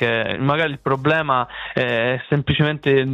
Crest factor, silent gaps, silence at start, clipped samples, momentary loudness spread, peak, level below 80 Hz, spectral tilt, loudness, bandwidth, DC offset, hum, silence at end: 18 dB; none; 0 s; under 0.1%; 4 LU; -2 dBFS; -48 dBFS; -8 dB/octave; -20 LUFS; 6.4 kHz; under 0.1%; none; 0 s